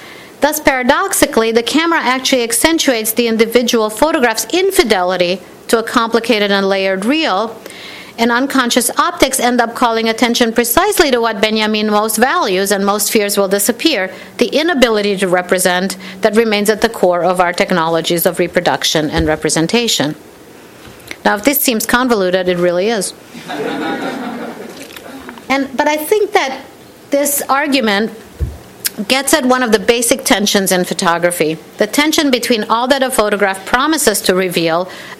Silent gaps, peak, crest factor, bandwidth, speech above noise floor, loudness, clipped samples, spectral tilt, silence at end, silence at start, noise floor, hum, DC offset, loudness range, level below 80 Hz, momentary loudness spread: none; 0 dBFS; 14 dB; 17 kHz; 24 dB; -13 LUFS; 0.1%; -3 dB/octave; 0 s; 0 s; -38 dBFS; none; under 0.1%; 3 LU; -40 dBFS; 9 LU